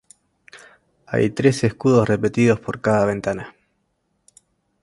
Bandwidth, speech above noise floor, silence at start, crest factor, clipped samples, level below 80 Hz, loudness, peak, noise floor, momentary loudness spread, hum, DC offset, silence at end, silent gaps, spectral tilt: 11.5 kHz; 51 dB; 0.55 s; 20 dB; under 0.1%; -52 dBFS; -19 LUFS; -2 dBFS; -70 dBFS; 9 LU; none; under 0.1%; 1.3 s; none; -7 dB/octave